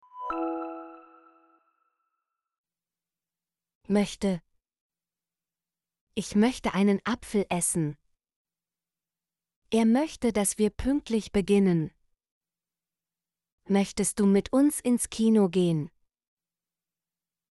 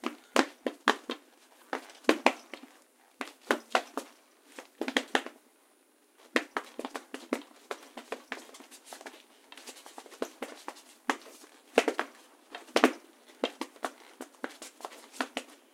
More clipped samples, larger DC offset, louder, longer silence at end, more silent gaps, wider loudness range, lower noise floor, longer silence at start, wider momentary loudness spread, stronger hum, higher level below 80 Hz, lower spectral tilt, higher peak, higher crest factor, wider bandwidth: neither; neither; first, -26 LUFS vs -34 LUFS; first, 1.65 s vs 0.25 s; first, 2.58-2.64 s, 3.75-3.81 s, 4.81-4.90 s, 6.01-6.07 s, 8.36-8.45 s, 9.56-9.62 s, 12.31-12.41 s, 13.52-13.58 s vs none; about the same, 9 LU vs 10 LU; first, under -90 dBFS vs -66 dBFS; about the same, 0.15 s vs 0.05 s; second, 11 LU vs 20 LU; neither; first, -54 dBFS vs -80 dBFS; first, -5.5 dB/octave vs -1.5 dB/octave; second, -12 dBFS vs 0 dBFS; second, 18 dB vs 36 dB; second, 11.5 kHz vs 16.5 kHz